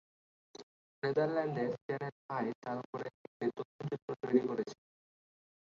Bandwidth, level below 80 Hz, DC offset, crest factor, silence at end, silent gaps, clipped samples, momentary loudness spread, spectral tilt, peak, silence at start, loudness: 7.4 kHz; -80 dBFS; under 0.1%; 22 dB; 0.95 s; 0.63-1.02 s, 1.82-1.89 s, 2.12-2.29 s, 2.55-2.62 s, 2.85-2.93 s, 3.14-3.40 s, 3.65-3.79 s, 4.02-4.08 s; under 0.1%; 20 LU; -6 dB/octave; -16 dBFS; 0.6 s; -37 LUFS